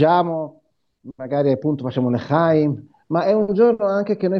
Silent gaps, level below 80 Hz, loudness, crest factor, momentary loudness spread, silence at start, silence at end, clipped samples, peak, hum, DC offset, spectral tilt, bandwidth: none; -62 dBFS; -19 LUFS; 16 dB; 10 LU; 0 s; 0 s; under 0.1%; -2 dBFS; none; under 0.1%; -9.5 dB/octave; 6.2 kHz